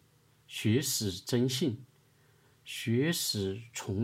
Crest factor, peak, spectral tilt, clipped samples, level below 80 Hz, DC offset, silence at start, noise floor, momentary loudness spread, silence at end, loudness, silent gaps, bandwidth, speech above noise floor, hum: 18 dB; -16 dBFS; -4.5 dB/octave; under 0.1%; -72 dBFS; under 0.1%; 0.5 s; -65 dBFS; 11 LU; 0 s; -32 LUFS; none; 16 kHz; 34 dB; none